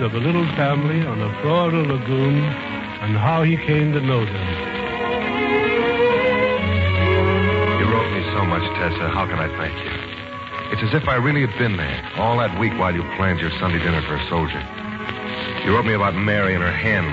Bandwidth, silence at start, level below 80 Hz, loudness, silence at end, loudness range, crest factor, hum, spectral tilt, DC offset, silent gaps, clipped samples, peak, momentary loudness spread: 7.4 kHz; 0 s; -40 dBFS; -20 LUFS; 0 s; 4 LU; 14 dB; none; -8 dB/octave; under 0.1%; none; under 0.1%; -6 dBFS; 8 LU